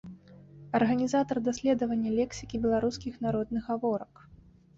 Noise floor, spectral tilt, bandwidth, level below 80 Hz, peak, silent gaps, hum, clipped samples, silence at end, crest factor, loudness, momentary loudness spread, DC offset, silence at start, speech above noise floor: -52 dBFS; -6 dB/octave; 7.8 kHz; -56 dBFS; -14 dBFS; none; none; under 0.1%; 0.45 s; 16 dB; -30 LUFS; 7 LU; under 0.1%; 0.05 s; 23 dB